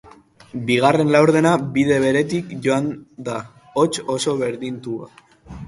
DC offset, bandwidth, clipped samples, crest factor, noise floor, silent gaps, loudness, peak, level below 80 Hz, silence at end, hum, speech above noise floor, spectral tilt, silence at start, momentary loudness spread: under 0.1%; 11.5 kHz; under 0.1%; 20 dB; -47 dBFS; none; -19 LUFS; 0 dBFS; -54 dBFS; 0 s; none; 28 dB; -5.5 dB/octave; 0.05 s; 15 LU